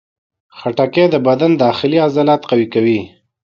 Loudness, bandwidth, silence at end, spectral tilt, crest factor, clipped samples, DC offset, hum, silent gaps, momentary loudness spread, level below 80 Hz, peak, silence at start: -14 LUFS; 6.8 kHz; 0.35 s; -8 dB/octave; 14 dB; under 0.1%; under 0.1%; none; none; 6 LU; -56 dBFS; 0 dBFS; 0.55 s